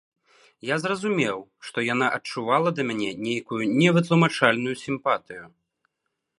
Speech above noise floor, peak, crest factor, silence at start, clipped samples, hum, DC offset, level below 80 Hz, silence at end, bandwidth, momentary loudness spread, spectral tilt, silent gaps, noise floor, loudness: 56 dB; -2 dBFS; 24 dB; 0.65 s; under 0.1%; none; under 0.1%; -70 dBFS; 0.9 s; 11 kHz; 10 LU; -5.5 dB/octave; none; -80 dBFS; -24 LUFS